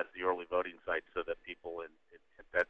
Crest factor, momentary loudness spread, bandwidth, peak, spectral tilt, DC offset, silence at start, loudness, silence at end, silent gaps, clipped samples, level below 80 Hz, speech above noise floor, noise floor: 22 dB; 10 LU; 7.2 kHz; -16 dBFS; -5.5 dB/octave; under 0.1%; 0 s; -38 LUFS; 0.05 s; none; under 0.1%; -66 dBFS; 23 dB; -61 dBFS